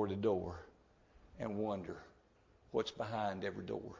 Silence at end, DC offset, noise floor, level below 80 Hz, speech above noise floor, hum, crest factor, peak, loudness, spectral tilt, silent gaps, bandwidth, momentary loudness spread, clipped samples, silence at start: 0 s; under 0.1%; -69 dBFS; -62 dBFS; 29 dB; none; 18 dB; -22 dBFS; -41 LUFS; -6.5 dB/octave; none; 7.6 kHz; 14 LU; under 0.1%; 0 s